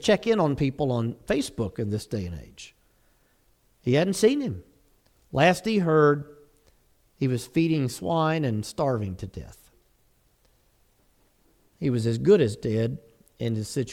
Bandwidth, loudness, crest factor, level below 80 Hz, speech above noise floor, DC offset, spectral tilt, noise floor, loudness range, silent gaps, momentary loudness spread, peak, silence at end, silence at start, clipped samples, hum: 16 kHz; -25 LUFS; 20 dB; -54 dBFS; 40 dB; under 0.1%; -6 dB/octave; -65 dBFS; 7 LU; none; 17 LU; -6 dBFS; 0 s; 0 s; under 0.1%; none